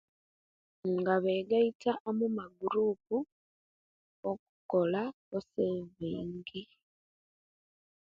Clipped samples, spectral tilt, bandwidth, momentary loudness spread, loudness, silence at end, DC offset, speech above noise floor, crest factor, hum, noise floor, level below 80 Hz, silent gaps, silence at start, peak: under 0.1%; -8 dB/octave; 7.2 kHz; 12 LU; -34 LUFS; 1.45 s; under 0.1%; over 58 dB; 20 dB; none; under -90 dBFS; -72 dBFS; 1.75-1.80 s, 2.00-2.05 s, 3.32-4.23 s, 4.39-4.69 s, 5.14-5.31 s; 0.85 s; -16 dBFS